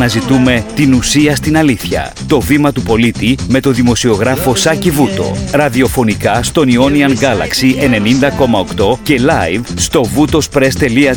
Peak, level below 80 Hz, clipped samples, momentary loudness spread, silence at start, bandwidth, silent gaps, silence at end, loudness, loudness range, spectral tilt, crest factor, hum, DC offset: 0 dBFS; -30 dBFS; under 0.1%; 4 LU; 0 s; 19.5 kHz; none; 0 s; -11 LUFS; 1 LU; -5 dB/octave; 10 dB; none; under 0.1%